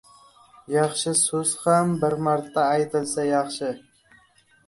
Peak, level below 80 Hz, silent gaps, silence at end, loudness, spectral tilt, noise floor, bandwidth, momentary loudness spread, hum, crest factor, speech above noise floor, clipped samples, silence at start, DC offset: -6 dBFS; -66 dBFS; none; 0.9 s; -23 LUFS; -4 dB/octave; -59 dBFS; 12 kHz; 8 LU; none; 18 dB; 36 dB; under 0.1%; 0.7 s; under 0.1%